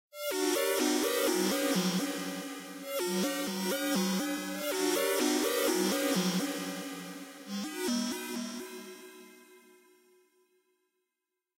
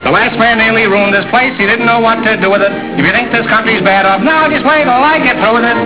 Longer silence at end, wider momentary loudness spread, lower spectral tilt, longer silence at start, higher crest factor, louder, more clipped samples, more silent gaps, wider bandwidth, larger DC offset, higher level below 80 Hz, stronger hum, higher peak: first, 2 s vs 0 s; first, 13 LU vs 2 LU; second, -3.5 dB/octave vs -8.5 dB/octave; first, 0.15 s vs 0 s; first, 16 dB vs 10 dB; second, -31 LUFS vs -9 LUFS; second, under 0.1% vs 0.1%; neither; first, 16 kHz vs 4 kHz; second, under 0.1% vs 0.8%; second, -80 dBFS vs -40 dBFS; neither; second, -16 dBFS vs 0 dBFS